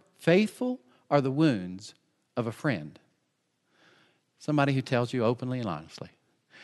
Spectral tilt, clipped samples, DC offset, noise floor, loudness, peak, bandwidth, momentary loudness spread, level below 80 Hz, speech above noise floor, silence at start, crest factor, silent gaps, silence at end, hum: -7 dB/octave; under 0.1%; under 0.1%; -76 dBFS; -28 LUFS; -8 dBFS; 12 kHz; 20 LU; -72 dBFS; 48 dB; 0.2 s; 22 dB; none; 0 s; none